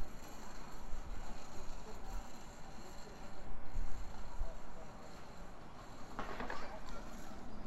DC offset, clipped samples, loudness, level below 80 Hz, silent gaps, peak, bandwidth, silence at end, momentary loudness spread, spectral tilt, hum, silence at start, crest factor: under 0.1%; under 0.1%; -51 LUFS; -46 dBFS; none; -22 dBFS; 12 kHz; 0 s; 7 LU; -4.5 dB/octave; none; 0 s; 14 dB